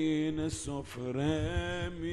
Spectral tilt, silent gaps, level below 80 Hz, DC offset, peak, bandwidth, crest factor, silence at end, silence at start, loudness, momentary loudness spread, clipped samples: -5.5 dB/octave; none; -46 dBFS; under 0.1%; -18 dBFS; 12.5 kHz; 16 dB; 0 s; 0 s; -34 LUFS; 7 LU; under 0.1%